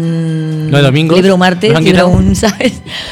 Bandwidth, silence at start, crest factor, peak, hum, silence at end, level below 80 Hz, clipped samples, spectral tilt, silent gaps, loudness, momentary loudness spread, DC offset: 14 kHz; 0 s; 10 dB; 0 dBFS; none; 0 s; -28 dBFS; under 0.1%; -6 dB/octave; none; -9 LUFS; 8 LU; under 0.1%